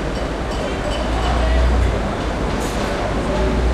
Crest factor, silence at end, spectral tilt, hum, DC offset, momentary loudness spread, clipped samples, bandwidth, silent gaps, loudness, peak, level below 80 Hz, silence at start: 14 dB; 0 s; -6 dB/octave; none; under 0.1%; 5 LU; under 0.1%; 12.5 kHz; none; -20 LUFS; -6 dBFS; -22 dBFS; 0 s